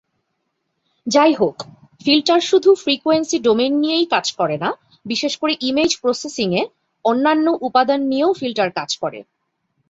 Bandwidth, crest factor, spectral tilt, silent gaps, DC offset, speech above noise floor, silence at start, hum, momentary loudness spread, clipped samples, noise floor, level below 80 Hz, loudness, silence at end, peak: 8 kHz; 16 dB; -3.5 dB/octave; none; under 0.1%; 55 dB; 1.05 s; none; 10 LU; under 0.1%; -72 dBFS; -62 dBFS; -18 LUFS; 0.7 s; -2 dBFS